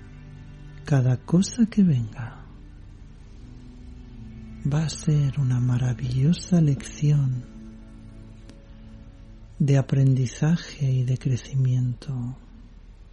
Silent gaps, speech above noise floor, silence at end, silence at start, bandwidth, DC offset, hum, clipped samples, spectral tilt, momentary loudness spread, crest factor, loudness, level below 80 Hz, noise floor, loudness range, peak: none; 23 dB; 0.1 s; 0 s; 10 kHz; under 0.1%; none; under 0.1%; -7 dB/octave; 24 LU; 16 dB; -24 LUFS; -44 dBFS; -45 dBFS; 5 LU; -10 dBFS